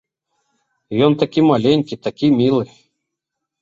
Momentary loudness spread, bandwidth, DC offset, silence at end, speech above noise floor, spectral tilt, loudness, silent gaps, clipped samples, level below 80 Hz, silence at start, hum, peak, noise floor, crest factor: 10 LU; 7.4 kHz; under 0.1%; 0.95 s; 65 dB; -8 dB/octave; -16 LUFS; none; under 0.1%; -58 dBFS; 0.9 s; none; -2 dBFS; -80 dBFS; 16 dB